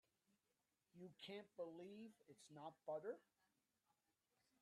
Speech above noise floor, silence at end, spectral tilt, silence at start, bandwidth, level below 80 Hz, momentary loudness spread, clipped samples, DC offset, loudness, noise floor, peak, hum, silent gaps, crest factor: over 34 dB; 1.4 s; -5 dB/octave; 0.95 s; 12.5 kHz; under -90 dBFS; 12 LU; under 0.1%; under 0.1%; -57 LUFS; under -90 dBFS; -40 dBFS; none; none; 20 dB